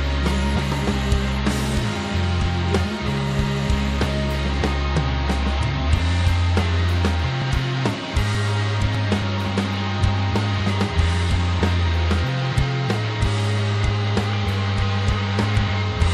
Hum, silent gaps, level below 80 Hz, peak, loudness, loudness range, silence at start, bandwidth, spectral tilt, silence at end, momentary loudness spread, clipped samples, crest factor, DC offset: none; none; -26 dBFS; -6 dBFS; -22 LUFS; 1 LU; 0 s; 12 kHz; -6 dB/octave; 0 s; 3 LU; under 0.1%; 14 dB; under 0.1%